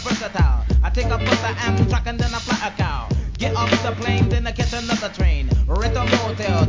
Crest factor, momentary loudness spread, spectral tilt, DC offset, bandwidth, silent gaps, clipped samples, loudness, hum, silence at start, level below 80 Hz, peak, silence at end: 16 dB; 4 LU; -5.5 dB/octave; 0.1%; 7.6 kHz; none; under 0.1%; -21 LUFS; none; 0 s; -22 dBFS; -2 dBFS; 0 s